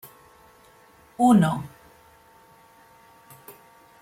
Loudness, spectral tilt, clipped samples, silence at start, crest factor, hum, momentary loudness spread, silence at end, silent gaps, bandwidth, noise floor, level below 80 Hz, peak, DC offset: -21 LUFS; -7 dB/octave; under 0.1%; 1.2 s; 20 dB; none; 29 LU; 0.5 s; none; 16.5 kHz; -54 dBFS; -62 dBFS; -6 dBFS; under 0.1%